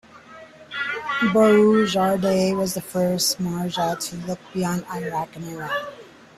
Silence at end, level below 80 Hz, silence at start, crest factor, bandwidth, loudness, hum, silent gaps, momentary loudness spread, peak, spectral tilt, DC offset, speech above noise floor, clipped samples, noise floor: 0.3 s; -58 dBFS; 0.15 s; 16 dB; 14.5 kHz; -22 LUFS; none; none; 14 LU; -6 dBFS; -4.5 dB/octave; under 0.1%; 23 dB; under 0.1%; -44 dBFS